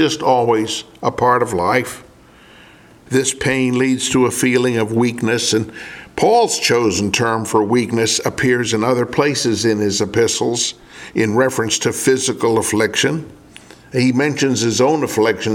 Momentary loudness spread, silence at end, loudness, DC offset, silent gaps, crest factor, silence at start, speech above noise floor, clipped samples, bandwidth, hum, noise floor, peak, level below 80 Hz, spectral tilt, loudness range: 6 LU; 0 s; -16 LUFS; under 0.1%; none; 16 dB; 0 s; 28 dB; under 0.1%; 17.5 kHz; none; -45 dBFS; 0 dBFS; -50 dBFS; -4 dB/octave; 2 LU